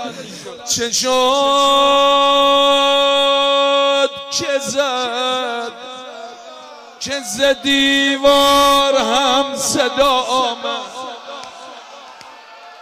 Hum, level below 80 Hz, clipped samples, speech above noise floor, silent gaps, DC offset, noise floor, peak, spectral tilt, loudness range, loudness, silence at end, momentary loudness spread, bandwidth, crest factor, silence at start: none; -50 dBFS; under 0.1%; 24 dB; none; under 0.1%; -38 dBFS; -2 dBFS; -1 dB/octave; 8 LU; -14 LUFS; 0.05 s; 20 LU; 16 kHz; 14 dB; 0 s